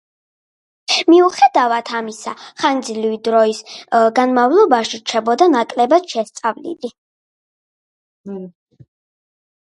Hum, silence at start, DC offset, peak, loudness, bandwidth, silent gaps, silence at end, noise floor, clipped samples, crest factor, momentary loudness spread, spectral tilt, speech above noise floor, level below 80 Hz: none; 0.9 s; under 0.1%; 0 dBFS; -15 LUFS; 11.5 kHz; 6.98-8.24 s; 1.25 s; under -90 dBFS; under 0.1%; 16 dB; 17 LU; -3.5 dB/octave; over 75 dB; -72 dBFS